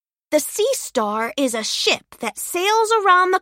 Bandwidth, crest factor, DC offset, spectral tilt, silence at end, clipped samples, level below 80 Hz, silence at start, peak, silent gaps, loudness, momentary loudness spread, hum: 16.5 kHz; 16 dB; under 0.1%; -1 dB/octave; 0 s; under 0.1%; -66 dBFS; 0.3 s; -4 dBFS; none; -19 LUFS; 8 LU; none